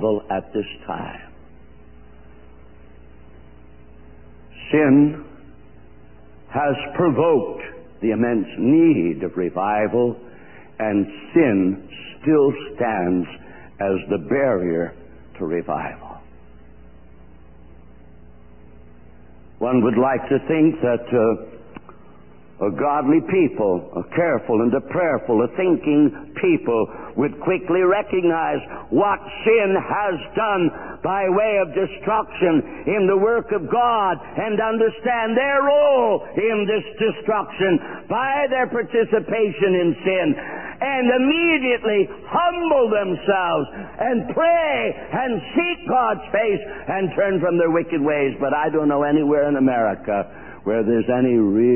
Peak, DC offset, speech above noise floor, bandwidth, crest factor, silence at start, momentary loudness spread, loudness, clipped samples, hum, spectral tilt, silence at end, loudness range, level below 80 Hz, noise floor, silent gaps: -4 dBFS; 0.6%; 28 dB; 3.2 kHz; 16 dB; 0 s; 9 LU; -20 LUFS; under 0.1%; none; -11.5 dB/octave; 0 s; 5 LU; -52 dBFS; -47 dBFS; none